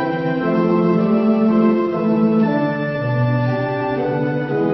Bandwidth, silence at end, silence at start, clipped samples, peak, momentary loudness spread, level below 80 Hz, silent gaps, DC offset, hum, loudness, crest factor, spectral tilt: 5.8 kHz; 0 s; 0 s; under 0.1%; -4 dBFS; 5 LU; -54 dBFS; none; under 0.1%; none; -17 LUFS; 12 dB; -10 dB/octave